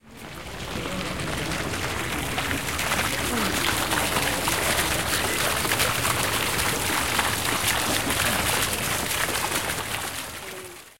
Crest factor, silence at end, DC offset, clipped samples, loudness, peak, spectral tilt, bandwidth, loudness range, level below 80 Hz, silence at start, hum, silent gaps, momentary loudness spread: 20 dB; 0 s; 0.6%; under 0.1%; -24 LUFS; -6 dBFS; -2 dB/octave; 17 kHz; 3 LU; -42 dBFS; 0 s; none; none; 9 LU